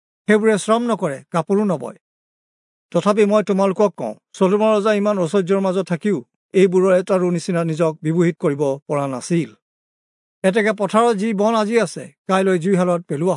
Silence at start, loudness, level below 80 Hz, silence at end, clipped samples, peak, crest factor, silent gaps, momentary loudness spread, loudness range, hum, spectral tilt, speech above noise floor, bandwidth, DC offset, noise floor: 0.3 s; -18 LUFS; -74 dBFS; 0 s; under 0.1%; -2 dBFS; 16 dB; 2.01-2.89 s, 6.36-6.49 s, 8.82-8.86 s, 9.62-10.42 s, 12.18-12.25 s; 7 LU; 3 LU; none; -6.5 dB/octave; over 73 dB; 11 kHz; under 0.1%; under -90 dBFS